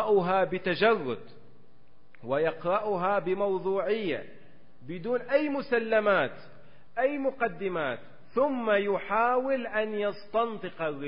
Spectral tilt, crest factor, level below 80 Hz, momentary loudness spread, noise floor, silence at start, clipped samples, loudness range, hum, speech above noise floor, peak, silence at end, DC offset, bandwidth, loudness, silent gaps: -9.5 dB/octave; 18 dB; -68 dBFS; 9 LU; -63 dBFS; 0 s; under 0.1%; 2 LU; none; 35 dB; -12 dBFS; 0 s; 0.7%; 5.4 kHz; -28 LUFS; none